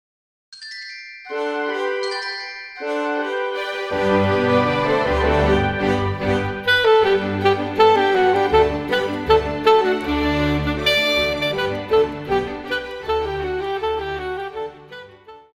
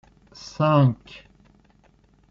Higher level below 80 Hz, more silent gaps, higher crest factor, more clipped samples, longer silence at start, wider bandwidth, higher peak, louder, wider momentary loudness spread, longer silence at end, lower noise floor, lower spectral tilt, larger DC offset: first, -38 dBFS vs -56 dBFS; neither; about the same, 16 dB vs 18 dB; neither; about the same, 0.5 s vs 0.45 s; first, 15.5 kHz vs 7.4 kHz; about the same, -4 dBFS vs -6 dBFS; about the same, -19 LUFS vs -20 LUFS; second, 14 LU vs 24 LU; second, 0.15 s vs 1.15 s; second, -43 dBFS vs -58 dBFS; second, -5.5 dB/octave vs -7.5 dB/octave; neither